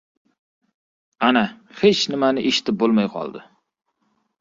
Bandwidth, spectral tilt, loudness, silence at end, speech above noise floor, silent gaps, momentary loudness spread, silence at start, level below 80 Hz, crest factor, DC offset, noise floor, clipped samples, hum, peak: 7.8 kHz; -4.5 dB/octave; -19 LUFS; 1 s; 50 dB; none; 9 LU; 1.2 s; -62 dBFS; 20 dB; under 0.1%; -69 dBFS; under 0.1%; none; -2 dBFS